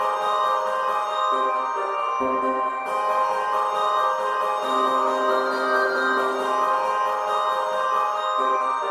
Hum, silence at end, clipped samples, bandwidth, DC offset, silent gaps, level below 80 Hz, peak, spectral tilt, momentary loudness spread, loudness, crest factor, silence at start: none; 0 s; under 0.1%; 15 kHz; under 0.1%; none; -72 dBFS; -8 dBFS; -2.5 dB/octave; 3 LU; -22 LUFS; 14 dB; 0 s